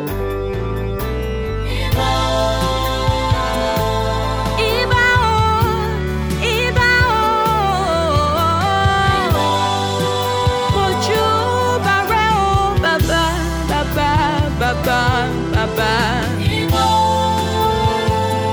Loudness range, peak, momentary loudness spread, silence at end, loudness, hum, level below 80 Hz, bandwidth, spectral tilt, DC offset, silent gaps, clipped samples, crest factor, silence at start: 3 LU; -2 dBFS; 6 LU; 0 s; -16 LUFS; none; -26 dBFS; over 20 kHz; -5 dB/octave; under 0.1%; none; under 0.1%; 14 dB; 0 s